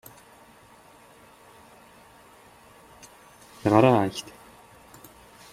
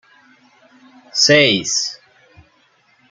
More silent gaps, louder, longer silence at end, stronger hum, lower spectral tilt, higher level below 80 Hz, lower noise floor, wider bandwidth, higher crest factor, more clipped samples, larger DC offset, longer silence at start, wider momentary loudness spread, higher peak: neither; second, -22 LUFS vs -14 LUFS; first, 1.3 s vs 1.15 s; neither; first, -6.5 dB/octave vs -2 dB/octave; about the same, -64 dBFS vs -62 dBFS; second, -53 dBFS vs -57 dBFS; first, 15.5 kHz vs 11 kHz; first, 26 dB vs 18 dB; neither; neither; first, 3.65 s vs 1.15 s; first, 31 LU vs 13 LU; about the same, -4 dBFS vs -2 dBFS